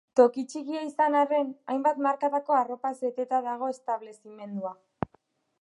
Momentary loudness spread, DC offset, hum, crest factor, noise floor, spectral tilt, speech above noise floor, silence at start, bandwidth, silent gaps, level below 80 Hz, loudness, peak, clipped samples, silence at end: 15 LU; under 0.1%; none; 20 dB; -67 dBFS; -6 dB/octave; 40 dB; 0.15 s; 11 kHz; none; -68 dBFS; -28 LUFS; -6 dBFS; under 0.1%; 0.9 s